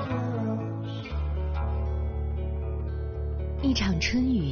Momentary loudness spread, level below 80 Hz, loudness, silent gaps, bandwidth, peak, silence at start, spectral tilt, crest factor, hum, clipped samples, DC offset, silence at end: 8 LU; -32 dBFS; -30 LUFS; none; 6.6 kHz; -14 dBFS; 0 s; -6 dB/octave; 14 dB; none; under 0.1%; under 0.1%; 0 s